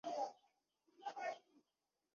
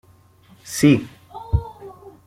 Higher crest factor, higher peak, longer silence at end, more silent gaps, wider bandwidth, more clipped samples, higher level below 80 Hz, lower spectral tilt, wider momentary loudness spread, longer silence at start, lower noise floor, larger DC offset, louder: about the same, 18 dB vs 20 dB; second, -32 dBFS vs -2 dBFS; first, 0.75 s vs 0.15 s; neither; second, 7.2 kHz vs 16 kHz; neither; second, under -90 dBFS vs -36 dBFS; second, -0.5 dB/octave vs -6 dB/octave; second, 8 LU vs 24 LU; second, 0.05 s vs 0.65 s; first, under -90 dBFS vs -52 dBFS; neither; second, -49 LUFS vs -20 LUFS